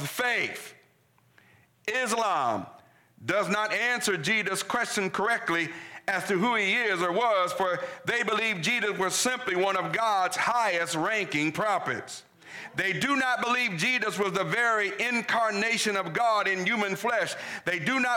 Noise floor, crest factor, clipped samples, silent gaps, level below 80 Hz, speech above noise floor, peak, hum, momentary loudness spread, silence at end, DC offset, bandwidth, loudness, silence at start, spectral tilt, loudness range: -64 dBFS; 12 dB; under 0.1%; none; -74 dBFS; 37 dB; -16 dBFS; none; 7 LU; 0 s; under 0.1%; 19 kHz; -26 LUFS; 0 s; -3 dB/octave; 2 LU